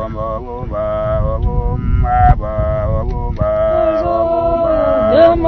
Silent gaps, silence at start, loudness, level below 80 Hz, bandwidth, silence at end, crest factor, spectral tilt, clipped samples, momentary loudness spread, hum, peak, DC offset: none; 0 s; -15 LUFS; -20 dBFS; 5.8 kHz; 0 s; 14 dB; -10 dB/octave; under 0.1%; 9 LU; none; 0 dBFS; under 0.1%